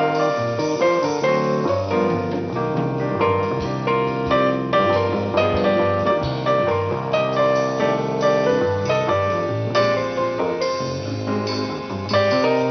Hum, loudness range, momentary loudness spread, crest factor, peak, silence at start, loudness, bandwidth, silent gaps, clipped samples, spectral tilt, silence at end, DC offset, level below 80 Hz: none; 2 LU; 5 LU; 14 dB; -6 dBFS; 0 s; -20 LUFS; 6.6 kHz; none; under 0.1%; -6 dB/octave; 0 s; under 0.1%; -48 dBFS